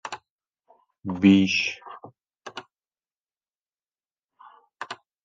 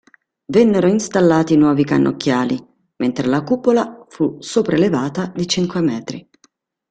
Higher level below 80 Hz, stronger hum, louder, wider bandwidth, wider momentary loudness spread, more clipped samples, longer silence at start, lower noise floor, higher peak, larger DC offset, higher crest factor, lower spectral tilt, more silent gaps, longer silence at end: second, -72 dBFS vs -54 dBFS; neither; second, -21 LUFS vs -17 LUFS; second, 7.8 kHz vs 9.2 kHz; first, 25 LU vs 9 LU; neither; second, 0.05 s vs 0.5 s; first, under -90 dBFS vs -59 dBFS; second, -6 dBFS vs -2 dBFS; neither; first, 22 dB vs 16 dB; about the same, -5.5 dB/octave vs -6 dB/octave; first, 0.30-0.39 s, 3.16-3.20 s, 3.55-3.65 s vs none; second, 0.3 s vs 0.7 s